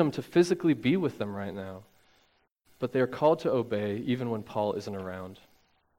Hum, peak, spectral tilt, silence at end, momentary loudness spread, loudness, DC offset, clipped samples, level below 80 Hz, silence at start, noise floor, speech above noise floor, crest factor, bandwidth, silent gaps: none; -10 dBFS; -7 dB/octave; 0.65 s; 15 LU; -29 LUFS; under 0.1%; under 0.1%; -68 dBFS; 0 s; -69 dBFS; 40 dB; 20 dB; 16 kHz; 2.52-2.56 s